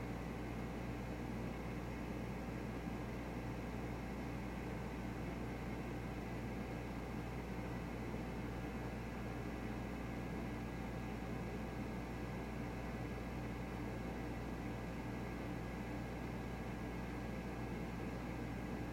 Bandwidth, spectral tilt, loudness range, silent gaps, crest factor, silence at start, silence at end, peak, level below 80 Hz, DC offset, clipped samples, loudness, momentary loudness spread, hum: 16.5 kHz; -7 dB/octave; 0 LU; none; 12 dB; 0 s; 0 s; -32 dBFS; -52 dBFS; under 0.1%; under 0.1%; -45 LUFS; 1 LU; none